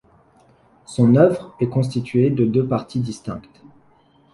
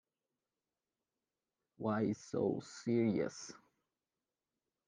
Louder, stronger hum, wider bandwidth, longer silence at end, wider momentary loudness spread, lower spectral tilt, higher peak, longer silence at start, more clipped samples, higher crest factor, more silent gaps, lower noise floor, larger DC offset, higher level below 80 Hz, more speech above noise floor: first, -19 LUFS vs -38 LUFS; neither; first, 11.5 kHz vs 9.6 kHz; second, 0.95 s vs 1.3 s; first, 17 LU vs 10 LU; first, -8.5 dB/octave vs -6.5 dB/octave; first, -2 dBFS vs -24 dBFS; second, 0.9 s vs 1.8 s; neither; about the same, 18 dB vs 18 dB; neither; second, -55 dBFS vs under -90 dBFS; neither; first, -54 dBFS vs -82 dBFS; second, 37 dB vs over 53 dB